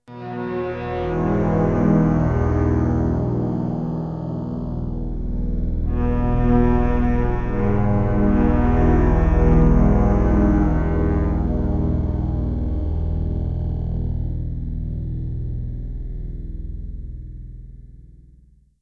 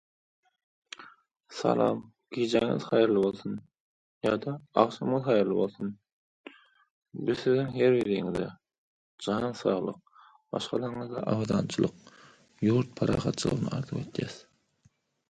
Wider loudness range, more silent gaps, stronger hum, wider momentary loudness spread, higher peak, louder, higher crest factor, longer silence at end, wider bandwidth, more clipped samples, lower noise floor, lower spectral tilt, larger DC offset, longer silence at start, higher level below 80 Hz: first, 12 LU vs 4 LU; second, none vs 3.80-4.21 s, 6.12-6.44 s, 6.90-7.02 s, 8.78-9.18 s; first, 60 Hz at -35 dBFS vs none; about the same, 15 LU vs 14 LU; about the same, -4 dBFS vs -6 dBFS; first, -21 LUFS vs -29 LUFS; second, 16 dB vs 24 dB; second, 0.75 s vs 0.9 s; second, 6.4 kHz vs 10.5 kHz; neither; second, -52 dBFS vs -68 dBFS; first, -10.5 dB/octave vs -6.5 dB/octave; neither; second, 0.1 s vs 1 s; first, -24 dBFS vs -60 dBFS